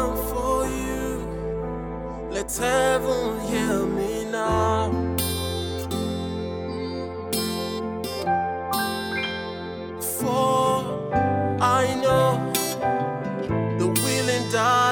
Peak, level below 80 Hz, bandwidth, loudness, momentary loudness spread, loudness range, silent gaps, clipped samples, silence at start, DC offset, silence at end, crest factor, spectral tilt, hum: -6 dBFS; -42 dBFS; 19 kHz; -24 LUFS; 9 LU; 5 LU; none; under 0.1%; 0 s; under 0.1%; 0 s; 18 dB; -4.5 dB/octave; none